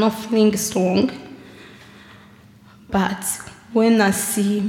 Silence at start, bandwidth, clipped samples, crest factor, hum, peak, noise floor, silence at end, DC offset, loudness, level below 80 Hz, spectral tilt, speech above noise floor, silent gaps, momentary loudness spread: 0 s; 17 kHz; under 0.1%; 18 dB; none; -4 dBFS; -47 dBFS; 0 s; under 0.1%; -19 LUFS; -54 dBFS; -4.5 dB/octave; 29 dB; none; 13 LU